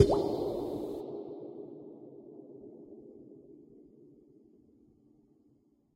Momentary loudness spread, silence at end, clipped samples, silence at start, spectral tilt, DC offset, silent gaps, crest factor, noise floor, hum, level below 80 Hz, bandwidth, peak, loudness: 24 LU; 2.15 s; under 0.1%; 0 s; -7.5 dB/octave; under 0.1%; none; 28 dB; -68 dBFS; none; -56 dBFS; 16 kHz; -8 dBFS; -36 LUFS